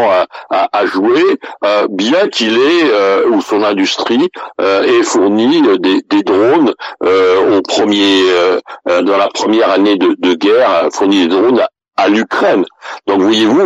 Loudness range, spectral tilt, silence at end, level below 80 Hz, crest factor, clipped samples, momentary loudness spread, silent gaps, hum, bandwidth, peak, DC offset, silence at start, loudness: 1 LU; -4 dB/octave; 0 s; -60 dBFS; 8 dB; under 0.1%; 5 LU; none; none; 8.2 kHz; -2 dBFS; under 0.1%; 0 s; -11 LUFS